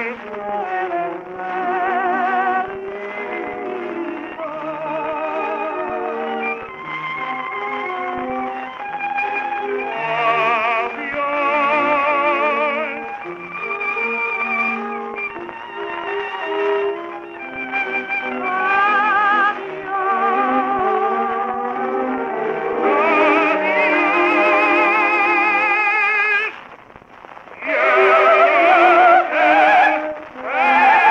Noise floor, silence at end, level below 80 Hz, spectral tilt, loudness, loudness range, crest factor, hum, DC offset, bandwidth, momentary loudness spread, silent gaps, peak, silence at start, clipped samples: -42 dBFS; 0 s; -60 dBFS; -5 dB/octave; -18 LUFS; 10 LU; 16 dB; none; under 0.1%; 8.4 kHz; 15 LU; none; -2 dBFS; 0 s; under 0.1%